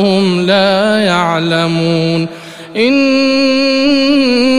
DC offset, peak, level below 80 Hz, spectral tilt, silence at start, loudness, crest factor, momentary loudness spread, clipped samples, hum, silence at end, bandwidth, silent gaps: under 0.1%; 0 dBFS; -50 dBFS; -5.5 dB/octave; 0 s; -11 LUFS; 10 dB; 5 LU; under 0.1%; none; 0 s; 11 kHz; none